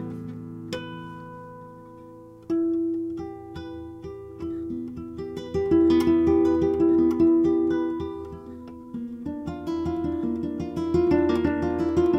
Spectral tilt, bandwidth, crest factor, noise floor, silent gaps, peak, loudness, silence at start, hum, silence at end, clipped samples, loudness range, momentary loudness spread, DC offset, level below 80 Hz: -8 dB/octave; 7.8 kHz; 16 dB; -45 dBFS; none; -10 dBFS; -24 LUFS; 0 s; none; 0 s; under 0.1%; 10 LU; 20 LU; under 0.1%; -52 dBFS